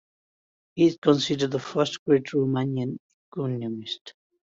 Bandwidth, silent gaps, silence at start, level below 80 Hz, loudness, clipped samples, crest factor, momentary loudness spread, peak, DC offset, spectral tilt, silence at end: 7.8 kHz; 0.98-1.02 s, 1.99-2.06 s, 3.00-3.32 s, 4.01-4.05 s; 0.75 s; -66 dBFS; -25 LUFS; under 0.1%; 20 dB; 14 LU; -6 dBFS; under 0.1%; -6 dB/octave; 0.45 s